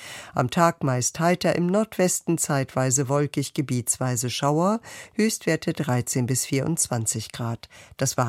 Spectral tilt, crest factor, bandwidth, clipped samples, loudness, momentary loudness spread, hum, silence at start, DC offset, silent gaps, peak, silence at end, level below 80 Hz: -4.5 dB/octave; 20 dB; 16.5 kHz; under 0.1%; -24 LUFS; 8 LU; none; 0 s; under 0.1%; none; -4 dBFS; 0 s; -60 dBFS